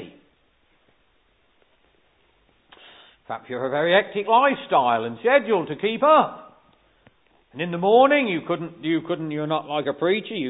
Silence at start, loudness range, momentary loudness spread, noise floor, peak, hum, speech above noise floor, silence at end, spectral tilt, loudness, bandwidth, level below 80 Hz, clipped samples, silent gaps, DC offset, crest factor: 0 s; 7 LU; 12 LU; -64 dBFS; -4 dBFS; none; 43 dB; 0 s; -10 dB/octave; -21 LUFS; 4 kHz; -70 dBFS; under 0.1%; none; under 0.1%; 20 dB